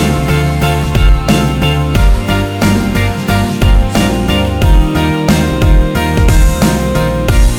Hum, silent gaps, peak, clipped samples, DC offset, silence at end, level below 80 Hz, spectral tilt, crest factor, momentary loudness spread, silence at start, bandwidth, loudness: none; none; 0 dBFS; under 0.1%; under 0.1%; 0 s; -12 dBFS; -6 dB/octave; 10 dB; 3 LU; 0 s; 16.5 kHz; -12 LUFS